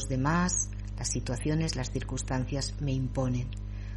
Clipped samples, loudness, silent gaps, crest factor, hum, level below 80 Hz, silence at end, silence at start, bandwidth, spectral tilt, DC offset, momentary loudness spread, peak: under 0.1%; -31 LUFS; none; 16 dB; 50 Hz at -35 dBFS; -38 dBFS; 0 s; 0 s; 11.5 kHz; -4.5 dB/octave; under 0.1%; 7 LU; -14 dBFS